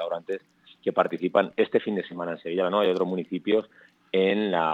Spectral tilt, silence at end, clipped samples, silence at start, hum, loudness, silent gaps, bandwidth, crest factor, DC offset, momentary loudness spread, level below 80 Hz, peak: -7.5 dB/octave; 0 s; under 0.1%; 0 s; none; -26 LUFS; none; 7.4 kHz; 20 dB; under 0.1%; 9 LU; -80 dBFS; -6 dBFS